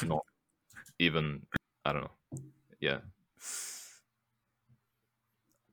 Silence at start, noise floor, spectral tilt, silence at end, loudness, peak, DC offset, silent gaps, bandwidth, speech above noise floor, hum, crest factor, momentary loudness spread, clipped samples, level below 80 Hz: 0 s; -82 dBFS; -4 dB/octave; 1.8 s; -35 LUFS; -12 dBFS; under 0.1%; none; over 20 kHz; 48 dB; none; 26 dB; 23 LU; under 0.1%; -62 dBFS